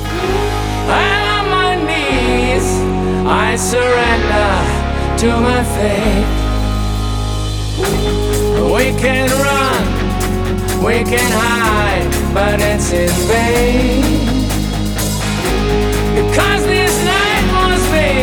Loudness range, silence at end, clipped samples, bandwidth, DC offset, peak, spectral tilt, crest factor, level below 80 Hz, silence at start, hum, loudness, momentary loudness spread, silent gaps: 2 LU; 0 s; under 0.1%; over 20 kHz; under 0.1%; 0 dBFS; -4.5 dB/octave; 14 dB; -20 dBFS; 0 s; none; -14 LUFS; 5 LU; none